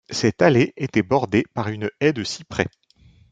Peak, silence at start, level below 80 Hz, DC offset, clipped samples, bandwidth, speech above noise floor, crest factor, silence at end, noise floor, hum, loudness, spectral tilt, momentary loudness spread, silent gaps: -2 dBFS; 0.1 s; -56 dBFS; under 0.1%; under 0.1%; 9.2 kHz; 33 dB; 18 dB; 0.65 s; -54 dBFS; none; -21 LUFS; -5.5 dB/octave; 10 LU; none